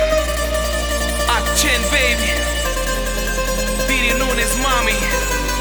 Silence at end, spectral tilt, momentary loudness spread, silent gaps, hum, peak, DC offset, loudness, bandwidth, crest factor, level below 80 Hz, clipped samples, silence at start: 0 s; -2.5 dB/octave; 5 LU; none; none; -2 dBFS; under 0.1%; -17 LUFS; over 20 kHz; 16 dB; -24 dBFS; under 0.1%; 0 s